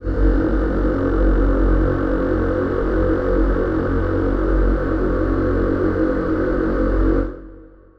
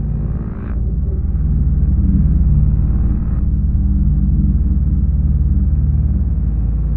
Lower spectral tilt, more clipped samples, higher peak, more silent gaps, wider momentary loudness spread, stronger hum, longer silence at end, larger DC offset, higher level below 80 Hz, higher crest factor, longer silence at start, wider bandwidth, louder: second, -10 dB/octave vs -14 dB/octave; neither; about the same, -4 dBFS vs -2 dBFS; neither; second, 2 LU vs 6 LU; neither; first, 0.3 s vs 0 s; neither; second, -22 dBFS vs -16 dBFS; about the same, 12 dB vs 12 dB; about the same, 0 s vs 0 s; first, 5 kHz vs 1.8 kHz; about the same, -19 LUFS vs -17 LUFS